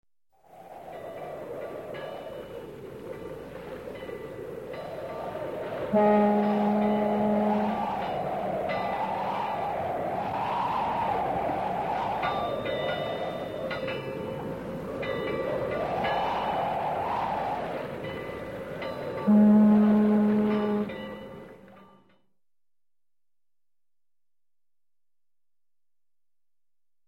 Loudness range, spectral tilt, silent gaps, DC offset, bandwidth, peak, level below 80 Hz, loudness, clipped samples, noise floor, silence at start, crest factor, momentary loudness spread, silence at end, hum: 15 LU; -8 dB/octave; none; under 0.1%; 6.2 kHz; -12 dBFS; -58 dBFS; -28 LUFS; under 0.1%; under -90 dBFS; 0.55 s; 16 dB; 17 LU; 5.25 s; none